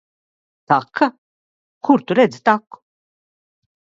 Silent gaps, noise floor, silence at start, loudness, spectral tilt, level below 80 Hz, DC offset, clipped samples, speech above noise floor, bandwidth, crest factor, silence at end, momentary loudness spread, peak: 1.18-1.81 s; under -90 dBFS; 0.7 s; -18 LUFS; -6.5 dB/octave; -68 dBFS; under 0.1%; under 0.1%; over 74 dB; 7.8 kHz; 20 dB; 1.4 s; 6 LU; 0 dBFS